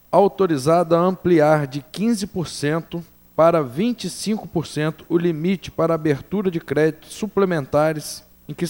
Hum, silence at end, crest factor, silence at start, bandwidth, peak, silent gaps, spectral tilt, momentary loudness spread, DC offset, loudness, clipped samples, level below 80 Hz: none; 0 s; 18 dB; 0.1 s; over 20 kHz; -2 dBFS; none; -6.5 dB/octave; 11 LU; under 0.1%; -20 LUFS; under 0.1%; -52 dBFS